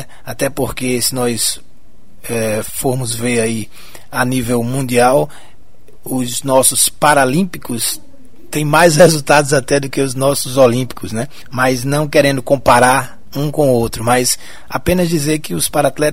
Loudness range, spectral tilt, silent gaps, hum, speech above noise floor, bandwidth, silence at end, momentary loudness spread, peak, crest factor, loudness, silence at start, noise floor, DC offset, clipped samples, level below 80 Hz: 5 LU; -4 dB/octave; none; none; 33 dB; 16.5 kHz; 0 s; 13 LU; 0 dBFS; 16 dB; -14 LUFS; 0 s; -47 dBFS; 4%; under 0.1%; -40 dBFS